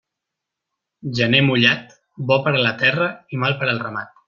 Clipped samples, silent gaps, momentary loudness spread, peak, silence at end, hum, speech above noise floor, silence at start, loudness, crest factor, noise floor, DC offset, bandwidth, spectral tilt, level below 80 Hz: under 0.1%; none; 13 LU; -2 dBFS; 0.2 s; none; 64 dB; 1.05 s; -18 LUFS; 20 dB; -83 dBFS; under 0.1%; 7.2 kHz; -6 dB/octave; -60 dBFS